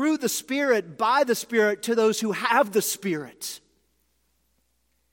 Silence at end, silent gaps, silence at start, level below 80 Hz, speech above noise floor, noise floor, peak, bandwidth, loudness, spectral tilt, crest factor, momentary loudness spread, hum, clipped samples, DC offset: 1.55 s; none; 0 s; -74 dBFS; 47 dB; -71 dBFS; -6 dBFS; 17 kHz; -24 LUFS; -3 dB/octave; 18 dB; 11 LU; none; under 0.1%; under 0.1%